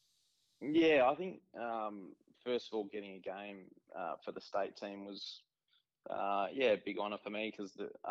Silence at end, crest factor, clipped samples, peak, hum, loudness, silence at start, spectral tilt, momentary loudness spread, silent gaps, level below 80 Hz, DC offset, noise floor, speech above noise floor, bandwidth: 0 s; 16 dB; under 0.1%; -22 dBFS; none; -38 LUFS; 0.6 s; -5.5 dB/octave; 17 LU; none; -80 dBFS; under 0.1%; -79 dBFS; 41 dB; 7.4 kHz